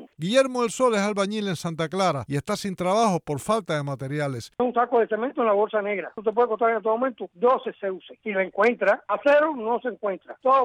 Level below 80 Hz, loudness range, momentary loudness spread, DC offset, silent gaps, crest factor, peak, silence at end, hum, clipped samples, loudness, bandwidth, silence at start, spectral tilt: -64 dBFS; 2 LU; 8 LU; under 0.1%; none; 16 dB; -8 dBFS; 0 s; none; under 0.1%; -24 LUFS; 15.5 kHz; 0 s; -5 dB/octave